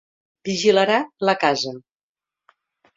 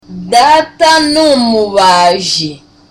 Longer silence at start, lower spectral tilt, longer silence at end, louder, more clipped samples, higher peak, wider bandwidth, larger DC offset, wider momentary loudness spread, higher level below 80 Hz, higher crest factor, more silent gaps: first, 0.45 s vs 0.1 s; about the same, -4 dB/octave vs -3 dB/octave; first, 1.15 s vs 0.35 s; second, -20 LUFS vs -8 LUFS; neither; about the same, -2 dBFS vs 0 dBFS; second, 7.8 kHz vs 16.5 kHz; neither; first, 14 LU vs 6 LU; second, -66 dBFS vs -44 dBFS; first, 20 dB vs 10 dB; neither